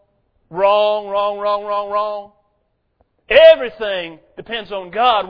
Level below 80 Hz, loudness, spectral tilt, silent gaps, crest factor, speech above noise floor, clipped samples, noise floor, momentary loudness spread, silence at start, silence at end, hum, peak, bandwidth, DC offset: -50 dBFS; -16 LUFS; -5.5 dB/octave; none; 16 dB; 51 dB; under 0.1%; -66 dBFS; 17 LU; 0.5 s; 0 s; none; 0 dBFS; 5.4 kHz; under 0.1%